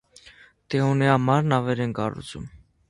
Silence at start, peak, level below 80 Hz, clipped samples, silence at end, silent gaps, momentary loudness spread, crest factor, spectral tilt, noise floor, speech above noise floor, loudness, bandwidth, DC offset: 0.25 s; -4 dBFS; -54 dBFS; under 0.1%; 0.35 s; none; 18 LU; 20 dB; -7 dB/octave; -52 dBFS; 30 dB; -23 LUFS; 11.5 kHz; under 0.1%